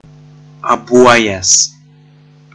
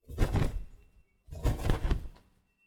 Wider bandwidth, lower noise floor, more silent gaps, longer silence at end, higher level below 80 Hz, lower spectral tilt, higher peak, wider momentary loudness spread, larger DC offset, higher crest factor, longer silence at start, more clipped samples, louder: second, 10.5 kHz vs 16.5 kHz; second, -43 dBFS vs -64 dBFS; neither; first, 0.85 s vs 0.5 s; second, -48 dBFS vs -34 dBFS; second, -2 dB/octave vs -6.5 dB/octave; first, 0 dBFS vs -14 dBFS; second, 9 LU vs 19 LU; neither; about the same, 14 dB vs 18 dB; first, 0.65 s vs 0.1 s; neither; first, -10 LUFS vs -34 LUFS